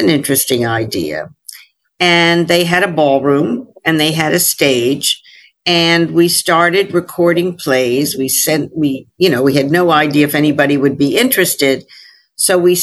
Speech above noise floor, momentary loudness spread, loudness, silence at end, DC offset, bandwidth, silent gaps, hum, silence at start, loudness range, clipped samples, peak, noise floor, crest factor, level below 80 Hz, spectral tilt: 29 dB; 7 LU; -12 LUFS; 0 s; under 0.1%; 12.5 kHz; none; none; 0 s; 1 LU; under 0.1%; 0 dBFS; -41 dBFS; 14 dB; -54 dBFS; -3.5 dB/octave